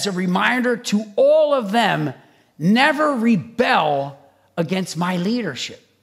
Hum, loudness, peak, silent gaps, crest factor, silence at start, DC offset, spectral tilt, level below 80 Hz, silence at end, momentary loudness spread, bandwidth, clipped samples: none; -19 LUFS; -2 dBFS; none; 18 dB; 0 s; under 0.1%; -5 dB/octave; -68 dBFS; 0.25 s; 11 LU; 15 kHz; under 0.1%